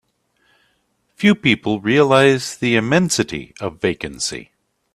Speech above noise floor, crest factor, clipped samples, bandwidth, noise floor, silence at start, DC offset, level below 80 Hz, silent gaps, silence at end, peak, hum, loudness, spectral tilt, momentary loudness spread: 48 dB; 18 dB; under 0.1%; 13.5 kHz; -65 dBFS; 1.2 s; under 0.1%; -52 dBFS; none; 0.5 s; 0 dBFS; none; -17 LUFS; -4.5 dB/octave; 11 LU